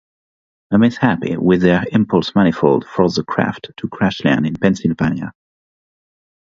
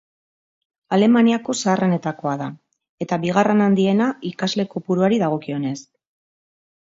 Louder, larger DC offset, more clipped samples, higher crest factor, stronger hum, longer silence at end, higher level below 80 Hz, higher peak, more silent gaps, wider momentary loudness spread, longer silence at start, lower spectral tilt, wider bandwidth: first, -16 LUFS vs -20 LUFS; neither; neither; about the same, 16 dB vs 18 dB; neither; first, 1.2 s vs 1.05 s; first, -46 dBFS vs -66 dBFS; about the same, 0 dBFS vs -2 dBFS; second, none vs 2.89-2.98 s; second, 7 LU vs 10 LU; second, 0.7 s vs 0.9 s; about the same, -7 dB/octave vs -6 dB/octave; about the same, 7.6 kHz vs 7.8 kHz